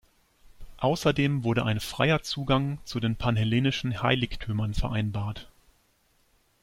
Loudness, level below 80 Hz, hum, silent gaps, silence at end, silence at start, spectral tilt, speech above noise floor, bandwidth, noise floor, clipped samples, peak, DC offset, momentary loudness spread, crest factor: -27 LUFS; -44 dBFS; none; none; 1.15 s; 0.6 s; -6 dB/octave; 40 dB; 16 kHz; -67 dBFS; under 0.1%; -8 dBFS; under 0.1%; 6 LU; 18 dB